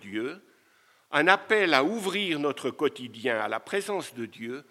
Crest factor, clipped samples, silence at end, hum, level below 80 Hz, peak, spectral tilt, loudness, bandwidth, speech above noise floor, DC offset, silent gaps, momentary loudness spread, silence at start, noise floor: 26 dB; under 0.1%; 0.1 s; none; -86 dBFS; -2 dBFS; -4 dB/octave; -27 LUFS; 15 kHz; 36 dB; under 0.1%; none; 15 LU; 0 s; -63 dBFS